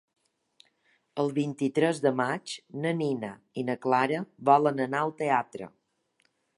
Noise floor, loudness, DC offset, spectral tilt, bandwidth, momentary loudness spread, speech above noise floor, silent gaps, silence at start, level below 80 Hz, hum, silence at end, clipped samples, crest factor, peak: -72 dBFS; -28 LUFS; under 0.1%; -6 dB/octave; 11.5 kHz; 15 LU; 45 dB; none; 1.15 s; -78 dBFS; none; 0.9 s; under 0.1%; 22 dB; -8 dBFS